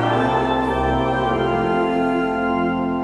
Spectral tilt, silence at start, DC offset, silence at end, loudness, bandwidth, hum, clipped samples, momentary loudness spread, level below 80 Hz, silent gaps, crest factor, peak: -7.5 dB/octave; 0 s; under 0.1%; 0 s; -20 LUFS; 10.5 kHz; none; under 0.1%; 2 LU; -36 dBFS; none; 12 dB; -8 dBFS